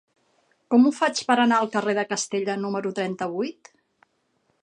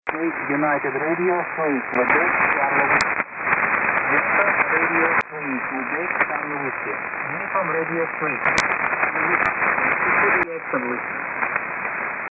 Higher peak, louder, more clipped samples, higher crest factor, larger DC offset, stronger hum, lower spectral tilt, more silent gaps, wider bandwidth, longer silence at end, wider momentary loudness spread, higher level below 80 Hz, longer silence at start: about the same, -6 dBFS vs -4 dBFS; second, -23 LUFS vs -20 LUFS; neither; about the same, 20 dB vs 18 dB; neither; neither; about the same, -4 dB/octave vs -5 dB/octave; neither; first, 10.5 kHz vs 8 kHz; first, 1.1 s vs 0.05 s; about the same, 9 LU vs 8 LU; second, -76 dBFS vs -56 dBFS; first, 0.7 s vs 0.05 s